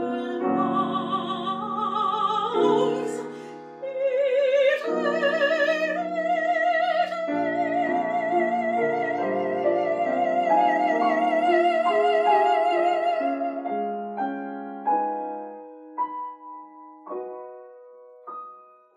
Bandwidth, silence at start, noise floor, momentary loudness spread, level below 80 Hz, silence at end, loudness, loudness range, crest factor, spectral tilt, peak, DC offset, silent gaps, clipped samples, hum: 9.8 kHz; 0 s; -48 dBFS; 16 LU; -88 dBFS; 0.35 s; -24 LUFS; 10 LU; 16 dB; -5.5 dB/octave; -8 dBFS; under 0.1%; none; under 0.1%; none